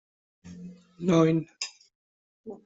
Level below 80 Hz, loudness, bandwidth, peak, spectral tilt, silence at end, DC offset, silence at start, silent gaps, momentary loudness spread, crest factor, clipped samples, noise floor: -68 dBFS; -26 LUFS; 8 kHz; -10 dBFS; -6.5 dB/octave; 0.1 s; under 0.1%; 0.45 s; 1.95-2.44 s; 25 LU; 20 dB; under 0.1%; -46 dBFS